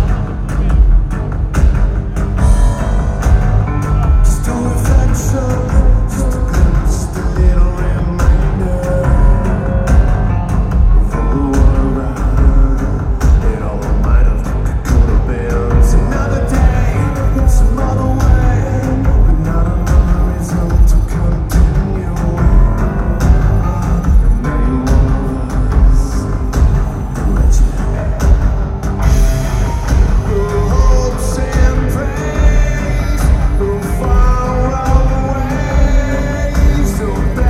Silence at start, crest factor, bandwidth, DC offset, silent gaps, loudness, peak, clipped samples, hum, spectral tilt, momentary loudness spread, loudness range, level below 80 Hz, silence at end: 0 s; 10 dB; 13 kHz; under 0.1%; none; -14 LUFS; 0 dBFS; under 0.1%; none; -7 dB/octave; 5 LU; 1 LU; -12 dBFS; 0 s